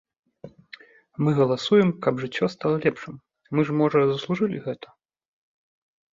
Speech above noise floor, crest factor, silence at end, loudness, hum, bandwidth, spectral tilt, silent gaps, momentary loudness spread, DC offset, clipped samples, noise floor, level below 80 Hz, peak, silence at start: 26 dB; 18 dB; 1.4 s; -23 LUFS; none; 7.6 kHz; -7.5 dB/octave; none; 18 LU; under 0.1%; under 0.1%; -49 dBFS; -64 dBFS; -6 dBFS; 0.45 s